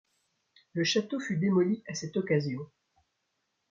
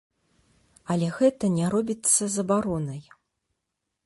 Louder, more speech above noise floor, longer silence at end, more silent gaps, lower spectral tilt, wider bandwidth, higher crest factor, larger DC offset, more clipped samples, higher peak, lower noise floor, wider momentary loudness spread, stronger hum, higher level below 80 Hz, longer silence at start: second, -30 LUFS vs -24 LUFS; second, 51 dB vs 57 dB; about the same, 1.05 s vs 1.05 s; neither; about the same, -5.5 dB/octave vs -5 dB/octave; second, 7.6 kHz vs 12 kHz; about the same, 18 dB vs 20 dB; neither; neither; second, -14 dBFS vs -8 dBFS; about the same, -80 dBFS vs -82 dBFS; about the same, 12 LU vs 12 LU; neither; second, -74 dBFS vs -60 dBFS; second, 0.75 s vs 0.9 s